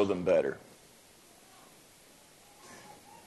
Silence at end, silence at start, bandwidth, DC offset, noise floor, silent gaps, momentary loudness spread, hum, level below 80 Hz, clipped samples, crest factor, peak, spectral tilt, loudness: 0.35 s; 0 s; 12.5 kHz; under 0.1%; -58 dBFS; none; 28 LU; none; -72 dBFS; under 0.1%; 22 dB; -14 dBFS; -6 dB/octave; -29 LUFS